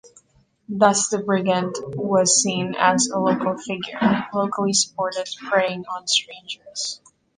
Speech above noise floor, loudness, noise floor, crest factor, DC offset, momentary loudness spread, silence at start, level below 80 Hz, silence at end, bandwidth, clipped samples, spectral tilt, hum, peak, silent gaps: 39 dB; -21 LUFS; -60 dBFS; 20 dB; under 0.1%; 12 LU; 0.05 s; -64 dBFS; 0.4 s; 10 kHz; under 0.1%; -3 dB/octave; none; -2 dBFS; none